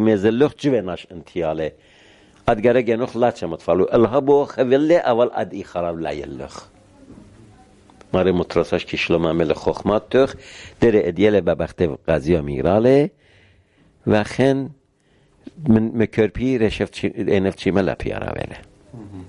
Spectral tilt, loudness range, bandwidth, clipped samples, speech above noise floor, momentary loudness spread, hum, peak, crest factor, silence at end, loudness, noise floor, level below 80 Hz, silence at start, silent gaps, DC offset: -7 dB/octave; 5 LU; 11 kHz; under 0.1%; 40 dB; 12 LU; none; -2 dBFS; 18 dB; 0 s; -19 LUFS; -59 dBFS; -42 dBFS; 0 s; none; under 0.1%